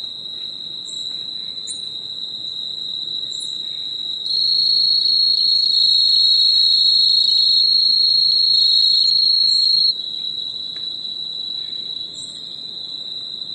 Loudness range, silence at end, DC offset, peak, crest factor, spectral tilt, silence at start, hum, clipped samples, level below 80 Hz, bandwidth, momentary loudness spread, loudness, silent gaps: 13 LU; 0 s; under 0.1%; -4 dBFS; 14 dB; 0.5 dB/octave; 0 s; none; under 0.1%; -70 dBFS; 11 kHz; 15 LU; -14 LUFS; none